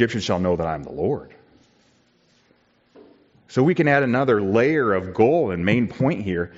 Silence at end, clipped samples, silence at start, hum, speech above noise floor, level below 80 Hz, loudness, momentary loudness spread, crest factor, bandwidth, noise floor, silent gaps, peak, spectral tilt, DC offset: 0.1 s; under 0.1%; 0 s; none; 41 dB; -56 dBFS; -21 LUFS; 8 LU; 18 dB; 7.8 kHz; -61 dBFS; none; -4 dBFS; -5.5 dB/octave; under 0.1%